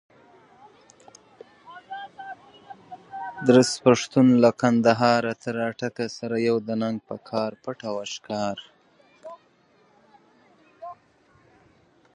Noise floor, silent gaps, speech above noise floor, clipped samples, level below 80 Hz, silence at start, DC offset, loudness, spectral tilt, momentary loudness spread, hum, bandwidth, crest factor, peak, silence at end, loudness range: -61 dBFS; none; 39 dB; under 0.1%; -68 dBFS; 1.7 s; under 0.1%; -23 LUFS; -5.5 dB/octave; 25 LU; none; 11 kHz; 24 dB; -2 dBFS; 1.2 s; 17 LU